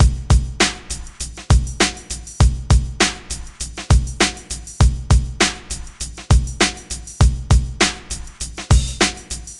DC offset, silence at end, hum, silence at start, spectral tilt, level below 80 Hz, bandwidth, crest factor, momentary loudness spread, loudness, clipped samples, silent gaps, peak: under 0.1%; 0 s; none; 0 s; -4 dB/octave; -20 dBFS; 12 kHz; 18 dB; 14 LU; -18 LUFS; under 0.1%; none; 0 dBFS